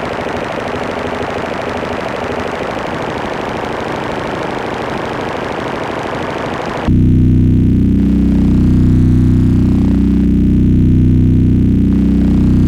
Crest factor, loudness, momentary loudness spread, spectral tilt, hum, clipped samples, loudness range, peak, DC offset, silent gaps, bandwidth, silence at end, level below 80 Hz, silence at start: 10 dB; -14 LUFS; 9 LU; -8 dB/octave; none; under 0.1%; 8 LU; -2 dBFS; under 0.1%; none; 9.4 kHz; 0 s; -22 dBFS; 0 s